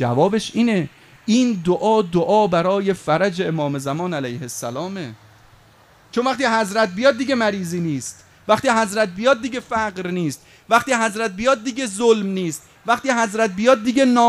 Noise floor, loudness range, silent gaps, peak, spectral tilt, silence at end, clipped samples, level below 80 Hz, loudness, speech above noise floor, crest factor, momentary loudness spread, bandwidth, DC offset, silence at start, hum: -51 dBFS; 5 LU; none; 0 dBFS; -5 dB/octave; 0 s; under 0.1%; -56 dBFS; -19 LUFS; 32 dB; 18 dB; 11 LU; 14.5 kHz; under 0.1%; 0 s; none